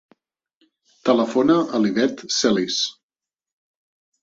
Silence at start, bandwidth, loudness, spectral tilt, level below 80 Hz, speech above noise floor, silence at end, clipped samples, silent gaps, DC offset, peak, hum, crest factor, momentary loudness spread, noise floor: 1.05 s; 8 kHz; -20 LUFS; -4 dB/octave; -64 dBFS; over 71 dB; 1.3 s; under 0.1%; none; under 0.1%; -4 dBFS; none; 18 dB; 5 LU; under -90 dBFS